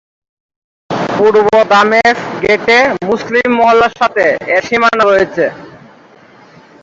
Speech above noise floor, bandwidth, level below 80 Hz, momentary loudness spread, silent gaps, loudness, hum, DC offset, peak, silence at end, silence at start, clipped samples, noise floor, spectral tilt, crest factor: 31 dB; 7.8 kHz; -48 dBFS; 8 LU; none; -10 LUFS; none; under 0.1%; 0 dBFS; 1.05 s; 0.9 s; under 0.1%; -41 dBFS; -4.5 dB/octave; 12 dB